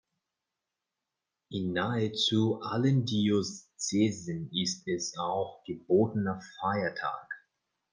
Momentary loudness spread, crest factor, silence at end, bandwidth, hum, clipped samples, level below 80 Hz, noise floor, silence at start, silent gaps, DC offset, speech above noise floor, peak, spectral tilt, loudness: 11 LU; 18 dB; 0.55 s; 10 kHz; none; under 0.1%; -70 dBFS; -88 dBFS; 1.5 s; none; under 0.1%; 58 dB; -14 dBFS; -5 dB/octave; -30 LUFS